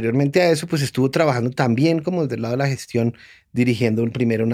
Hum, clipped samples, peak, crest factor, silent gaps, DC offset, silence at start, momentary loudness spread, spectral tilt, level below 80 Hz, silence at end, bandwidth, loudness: none; under 0.1%; -2 dBFS; 18 dB; none; under 0.1%; 0 s; 5 LU; -6.5 dB/octave; -60 dBFS; 0 s; 15.5 kHz; -20 LUFS